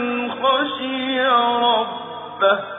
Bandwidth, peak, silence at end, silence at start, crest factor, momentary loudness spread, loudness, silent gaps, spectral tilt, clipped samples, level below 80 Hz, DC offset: 3.9 kHz; -4 dBFS; 0 s; 0 s; 16 dB; 10 LU; -19 LUFS; none; -6.5 dB/octave; under 0.1%; -68 dBFS; under 0.1%